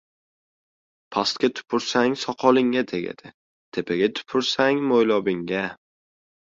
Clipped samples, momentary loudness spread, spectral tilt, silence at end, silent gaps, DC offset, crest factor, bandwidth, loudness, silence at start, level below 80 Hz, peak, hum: under 0.1%; 11 LU; -4.5 dB/octave; 0.75 s; 3.34-3.72 s; under 0.1%; 20 dB; 7.8 kHz; -23 LUFS; 1.1 s; -64 dBFS; -4 dBFS; none